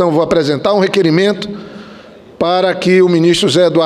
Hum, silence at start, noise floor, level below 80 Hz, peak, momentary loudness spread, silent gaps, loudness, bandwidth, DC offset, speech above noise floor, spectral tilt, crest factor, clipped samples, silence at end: none; 0 s; -36 dBFS; -48 dBFS; 0 dBFS; 15 LU; none; -12 LUFS; 12.5 kHz; under 0.1%; 25 dB; -5.5 dB/octave; 12 dB; under 0.1%; 0 s